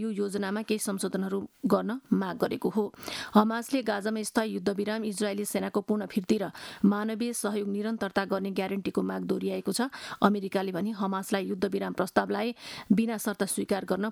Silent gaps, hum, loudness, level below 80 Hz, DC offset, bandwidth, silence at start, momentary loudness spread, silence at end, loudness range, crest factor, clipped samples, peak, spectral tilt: none; none; -30 LUFS; -68 dBFS; under 0.1%; 18 kHz; 0 s; 5 LU; 0 s; 1 LU; 22 dB; under 0.1%; -6 dBFS; -5 dB/octave